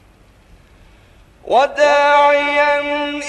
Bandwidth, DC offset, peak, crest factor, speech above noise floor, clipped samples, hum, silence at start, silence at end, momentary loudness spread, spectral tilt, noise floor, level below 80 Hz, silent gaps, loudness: 9.8 kHz; under 0.1%; -2 dBFS; 14 dB; 34 dB; under 0.1%; none; 1.45 s; 0 s; 6 LU; -2.5 dB/octave; -48 dBFS; -50 dBFS; none; -13 LUFS